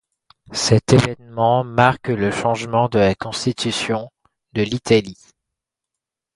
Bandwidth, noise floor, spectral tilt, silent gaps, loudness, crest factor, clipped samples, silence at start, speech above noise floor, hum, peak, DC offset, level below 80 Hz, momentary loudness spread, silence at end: 11.5 kHz; -84 dBFS; -5 dB/octave; none; -19 LUFS; 20 dB; under 0.1%; 0.5 s; 66 dB; none; 0 dBFS; under 0.1%; -48 dBFS; 10 LU; 1.2 s